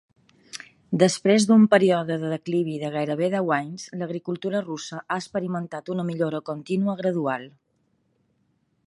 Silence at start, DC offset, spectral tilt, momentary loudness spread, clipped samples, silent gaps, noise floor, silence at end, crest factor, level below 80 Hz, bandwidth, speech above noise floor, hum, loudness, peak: 0.55 s; under 0.1%; -5.5 dB/octave; 15 LU; under 0.1%; none; -69 dBFS; 1.4 s; 20 dB; -70 dBFS; 11.5 kHz; 46 dB; none; -24 LUFS; -4 dBFS